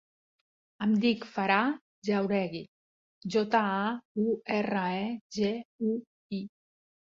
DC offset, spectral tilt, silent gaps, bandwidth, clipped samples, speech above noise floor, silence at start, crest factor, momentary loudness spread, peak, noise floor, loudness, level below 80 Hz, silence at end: under 0.1%; -6.5 dB/octave; 1.81-2.02 s, 2.68-3.21 s, 4.05-4.15 s, 5.21-5.30 s, 5.65-5.79 s, 6.07-6.30 s; 7.4 kHz; under 0.1%; over 61 dB; 0.8 s; 20 dB; 12 LU; -12 dBFS; under -90 dBFS; -30 LUFS; -72 dBFS; 0.65 s